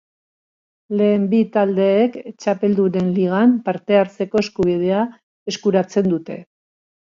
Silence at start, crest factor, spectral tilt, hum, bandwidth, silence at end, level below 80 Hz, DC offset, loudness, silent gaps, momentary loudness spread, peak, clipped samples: 0.9 s; 16 dB; -7 dB/octave; none; 7.4 kHz; 0.6 s; -58 dBFS; under 0.1%; -18 LUFS; 5.23-5.46 s; 10 LU; -2 dBFS; under 0.1%